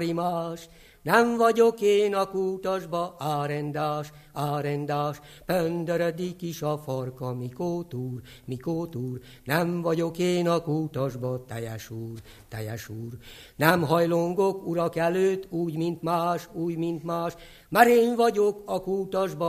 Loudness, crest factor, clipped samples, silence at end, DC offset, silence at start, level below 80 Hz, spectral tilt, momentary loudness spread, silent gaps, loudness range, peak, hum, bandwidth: -26 LUFS; 24 dB; under 0.1%; 0 s; under 0.1%; 0 s; -58 dBFS; -6 dB/octave; 15 LU; none; 6 LU; -2 dBFS; none; 15 kHz